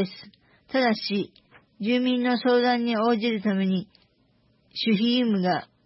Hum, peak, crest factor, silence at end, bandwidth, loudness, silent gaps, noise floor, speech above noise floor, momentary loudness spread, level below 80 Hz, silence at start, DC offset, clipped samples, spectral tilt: none; -10 dBFS; 14 dB; 0.2 s; 5.8 kHz; -24 LUFS; none; -64 dBFS; 41 dB; 10 LU; -72 dBFS; 0 s; under 0.1%; under 0.1%; -9.5 dB/octave